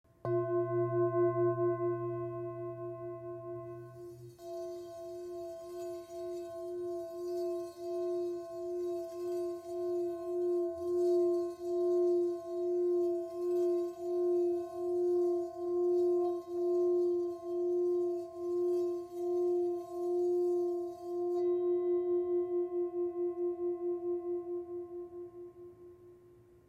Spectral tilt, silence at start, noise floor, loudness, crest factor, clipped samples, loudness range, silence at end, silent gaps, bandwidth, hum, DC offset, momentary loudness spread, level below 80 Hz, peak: -8.5 dB/octave; 0.25 s; -60 dBFS; -35 LUFS; 14 dB; under 0.1%; 10 LU; 0.4 s; none; 8.2 kHz; none; under 0.1%; 13 LU; -76 dBFS; -22 dBFS